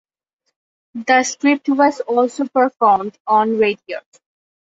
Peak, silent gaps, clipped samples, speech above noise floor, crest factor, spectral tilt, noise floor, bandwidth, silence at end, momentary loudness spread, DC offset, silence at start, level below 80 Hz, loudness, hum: -2 dBFS; 3.20-3.25 s; under 0.1%; 58 dB; 16 dB; -3.5 dB/octave; -74 dBFS; 8 kHz; 0.65 s; 13 LU; under 0.1%; 0.95 s; -66 dBFS; -16 LUFS; none